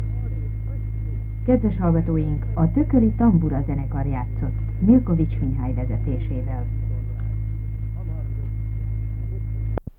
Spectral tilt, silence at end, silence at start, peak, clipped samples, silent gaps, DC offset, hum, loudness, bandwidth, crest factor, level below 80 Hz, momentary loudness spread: -12.5 dB/octave; 0.1 s; 0 s; -4 dBFS; under 0.1%; none; under 0.1%; none; -23 LUFS; 2.9 kHz; 18 dB; -28 dBFS; 11 LU